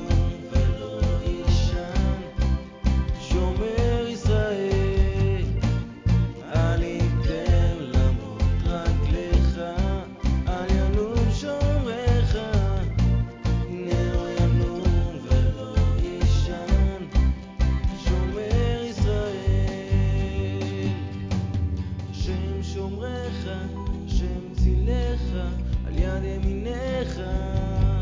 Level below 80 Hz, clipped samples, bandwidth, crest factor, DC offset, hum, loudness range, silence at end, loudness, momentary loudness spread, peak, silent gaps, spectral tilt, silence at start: -26 dBFS; under 0.1%; 7.6 kHz; 16 dB; under 0.1%; none; 4 LU; 0 s; -25 LUFS; 6 LU; -8 dBFS; none; -7.5 dB/octave; 0 s